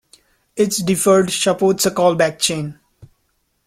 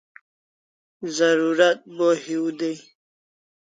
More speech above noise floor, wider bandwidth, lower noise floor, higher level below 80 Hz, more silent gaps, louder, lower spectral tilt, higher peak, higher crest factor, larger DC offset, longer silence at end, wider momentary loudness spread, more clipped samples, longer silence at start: second, 50 dB vs over 69 dB; first, 16 kHz vs 9.4 kHz; second, -66 dBFS vs under -90 dBFS; first, -54 dBFS vs -78 dBFS; neither; first, -16 LUFS vs -22 LUFS; about the same, -4 dB/octave vs -4 dB/octave; about the same, -2 dBFS vs -4 dBFS; about the same, 16 dB vs 20 dB; neither; about the same, 0.95 s vs 0.95 s; about the same, 10 LU vs 12 LU; neither; second, 0.55 s vs 1 s